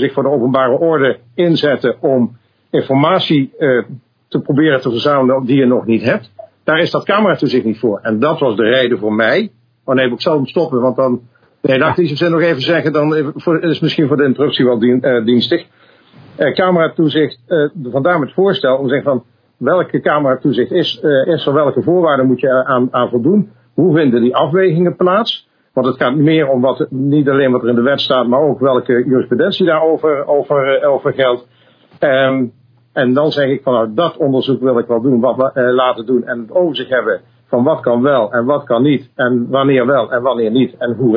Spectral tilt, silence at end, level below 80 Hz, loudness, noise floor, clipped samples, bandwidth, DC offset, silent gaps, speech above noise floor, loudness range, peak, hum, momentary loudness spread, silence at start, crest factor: -8.5 dB/octave; 0 s; -62 dBFS; -13 LUFS; -43 dBFS; under 0.1%; 5.4 kHz; under 0.1%; none; 31 dB; 2 LU; 0 dBFS; none; 5 LU; 0 s; 14 dB